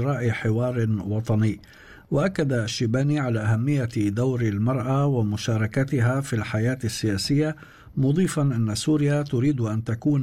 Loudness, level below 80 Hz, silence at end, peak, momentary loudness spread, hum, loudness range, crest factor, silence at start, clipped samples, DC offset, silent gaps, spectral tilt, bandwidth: -24 LUFS; -52 dBFS; 0 s; -12 dBFS; 4 LU; none; 1 LU; 10 dB; 0 s; under 0.1%; under 0.1%; none; -6.5 dB/octave; 14 kHz